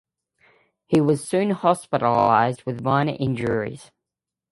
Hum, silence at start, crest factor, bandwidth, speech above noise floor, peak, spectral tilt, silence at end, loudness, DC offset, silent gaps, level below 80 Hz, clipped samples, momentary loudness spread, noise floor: none; 0.9 s; 20 dB; 11.5 kHz; 66 dB; -4 dBFS; -6.5 dB/octave; 0.7 s; -21 LUFS; under 0.1%; none; -56 dBFS; under 0.1%; 9 LU; -87 dBFS